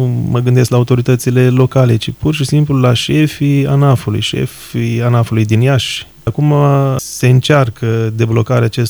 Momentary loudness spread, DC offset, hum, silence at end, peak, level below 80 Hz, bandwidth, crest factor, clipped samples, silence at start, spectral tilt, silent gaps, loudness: 6 LU; under 0.1%; none; 0 s; 0 dBFS; -40 dBFS; over 20 kHz; 12 dB; under 0.1%; 0 s; -6.5 dB/octave; none; -12 LUFS